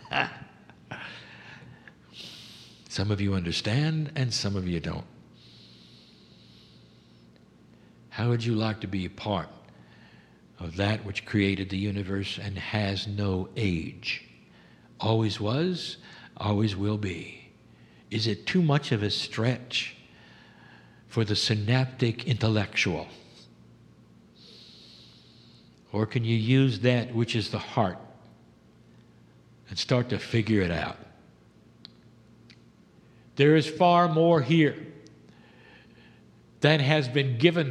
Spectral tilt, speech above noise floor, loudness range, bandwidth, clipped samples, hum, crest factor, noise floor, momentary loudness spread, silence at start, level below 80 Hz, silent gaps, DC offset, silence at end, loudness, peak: -6 dB/octave; 30 dB; 9 LU; 11 kHz; under 0.1%; none; 26 dB; -56 dBFS; 21 LU; 0 s; -58 dBFS; none; under 0.1%; 0 s; -27 LUFS; -4 dBFS